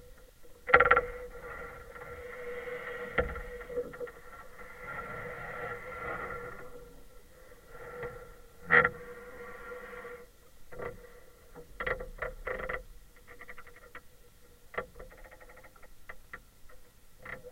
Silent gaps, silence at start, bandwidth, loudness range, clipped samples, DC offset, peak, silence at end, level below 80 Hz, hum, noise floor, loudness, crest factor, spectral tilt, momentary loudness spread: none; 0 s; 16 kHz; 17 LU; under 0.1%; under 0.1%; -4 dBFS; 0 s; -52 dBFS; none; -56 dBFS; -33 LUFS; 34 dB; -5 dB/octave; 27 LU